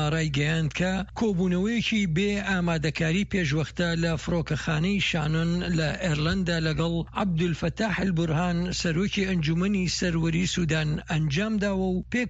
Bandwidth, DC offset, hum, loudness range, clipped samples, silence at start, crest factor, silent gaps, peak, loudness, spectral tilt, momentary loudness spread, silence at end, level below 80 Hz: 8 kHz; under 0.1%; none; 1 LU; under 0.1%; 0 s; 14 dB; none; -12 dBFS; -26 LUFS; -5.5 dB/octave; 3 LU; 0 s; -42 dBFS